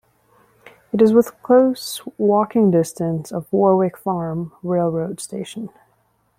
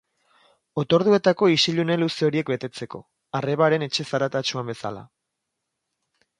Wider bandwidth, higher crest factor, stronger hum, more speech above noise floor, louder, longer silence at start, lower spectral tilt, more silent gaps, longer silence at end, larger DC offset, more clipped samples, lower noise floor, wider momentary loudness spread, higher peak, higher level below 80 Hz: first, 16 kHz vs 11.5 kHz; about the same, 16 dB vs 20 dB; neither; second, 45 dB vs 58 dB; first, -19 LUFS vs -22 LUFS; first, 0.95 s vs 0.75 s; first, -7 dB/octave vs -5.5 dB/octave; neither; second, 0.7 s vs 1.35 s; neither; neither; second, -63 dBFS vs -81 dBFS; about the same, 14 LU vs 15 LU; about the same, -2 dBFS vs -4 dBFS; first, -60 dBFS vs -66 dBFS